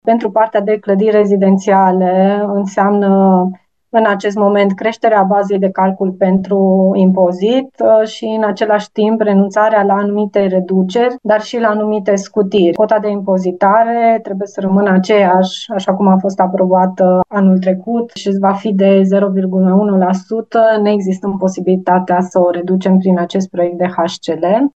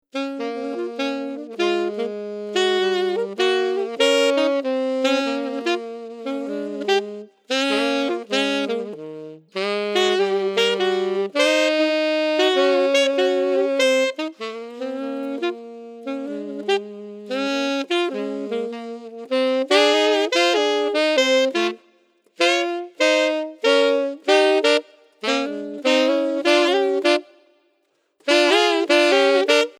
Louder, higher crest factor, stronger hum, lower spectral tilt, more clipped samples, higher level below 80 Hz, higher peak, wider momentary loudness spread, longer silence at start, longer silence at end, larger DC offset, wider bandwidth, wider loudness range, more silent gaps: first, -12 LUFS vs -20 LUFS; second, 12 dB vs 18 dB; neither; first, -7.5 dB/octave vs -2.5 dB/octave; neither; first, -58 dBFS vs under -90 dBFS; about the same, 0 dBFS vs -2 dBFS; second, 6 LU vs 13 LU; about the same, 0.05 s vs 0.15 s; about the same, 0.05 s vs 0.1 s; first, 0.1% vs under 0.1%; second, 8 kHz vs 14.5 kHz; second, 2 LU vs 6 LU; neither